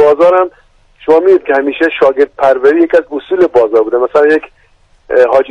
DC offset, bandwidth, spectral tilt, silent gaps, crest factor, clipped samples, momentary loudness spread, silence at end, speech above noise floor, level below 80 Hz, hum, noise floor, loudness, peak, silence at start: under 0.1%; 8 kHz; -6 dB/octave; none; 10 dB; 0.1%; 6 LU; 0 s; 39 dB; -48 dBFS; none; -48 dBFS; -10 LUFS; 0 dBFS; 0 s